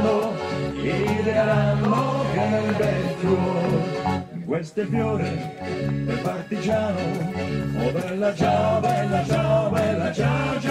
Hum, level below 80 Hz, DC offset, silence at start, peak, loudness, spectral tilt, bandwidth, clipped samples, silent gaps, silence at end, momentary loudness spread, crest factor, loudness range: none; -46 dBFS; under 0.1%; 0 s; -8 dBFS; -23 LUFS; -7 dB/octave; 13 kHz; under 0.1%; none; 0 s; 7 LU; 14 dB; 4 LU